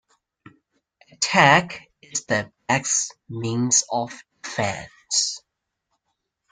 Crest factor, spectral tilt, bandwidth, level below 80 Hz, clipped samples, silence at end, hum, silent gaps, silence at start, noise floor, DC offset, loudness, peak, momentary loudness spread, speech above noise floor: 24 dB; -2.5 dB/octave; 10.5 kHz; -62 dBFS; under 0.1%; 1.15 s; none; none; 1.2 s; -80 dBFS; under 0.1%; -21 LUFS; -2 dBFS; 19 LU; 58 dB